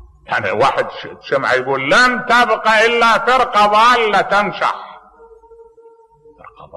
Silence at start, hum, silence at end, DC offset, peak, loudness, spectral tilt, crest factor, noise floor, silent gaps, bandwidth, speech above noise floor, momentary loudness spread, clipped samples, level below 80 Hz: 0.3 s; none; 0 s; under 0.1%; -4 dBFS; -13 LUFS; -3 dB/octave; 12 dB; -47 dBFS; none; 12 kHz; 33 dB; 10 LU; under 0.1%; -48 dBFS